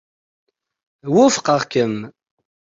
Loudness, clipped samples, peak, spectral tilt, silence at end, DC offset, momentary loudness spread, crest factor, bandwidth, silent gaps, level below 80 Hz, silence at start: -17 LUFS; under 0.1%; -2 dBFS; -4.5 dB/octave; 0.65 s; under 0.1%; 19 LU; 18 dB; 7.8 kHz; none; -62 dBFS; 1.05 s